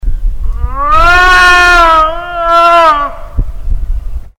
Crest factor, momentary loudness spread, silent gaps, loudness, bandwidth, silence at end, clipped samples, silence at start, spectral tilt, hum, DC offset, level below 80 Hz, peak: 8 dB; 17 LU; none; -6 LUFS; 16 kHz; 0.1 s; 1%; 0 s; -3.5 dB/octave; none; under 0.1%; -16 dBFS; 0 dBFS